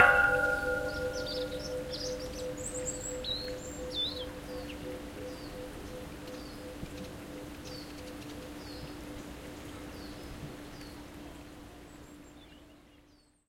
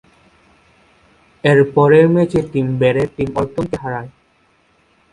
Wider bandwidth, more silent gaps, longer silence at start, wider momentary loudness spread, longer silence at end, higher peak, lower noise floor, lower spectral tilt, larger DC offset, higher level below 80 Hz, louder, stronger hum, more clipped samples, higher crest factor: first, 16.5 kHz vs 11 kHz; neither; second, 0 s vs 1.45 s; about the same, 15 LU vs 13 LU; second, 0.3 s vs 1.05 s; second, -8 dBFS vs 0 dBFS; first, -63 dBFS vs -57 dBFS; second, -3 dB/octave vs -8 dB/octave; neither; second, -52 dBFS vs -46 dBFS; second, -36 LUFS vs -15 LUFS; neither; neither; first, 28 dB vs 16 dB